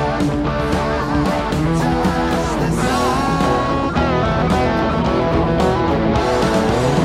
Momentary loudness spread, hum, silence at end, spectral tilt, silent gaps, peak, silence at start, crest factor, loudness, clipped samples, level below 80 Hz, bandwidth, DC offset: 2 LU; none; 0 s; -6.5 dB/octave; none; -4 dBFS; 0 s; 12 dB; -17 LUFS; under 0.1%; -28 dBFS; 15.5 kHz; under 0.1%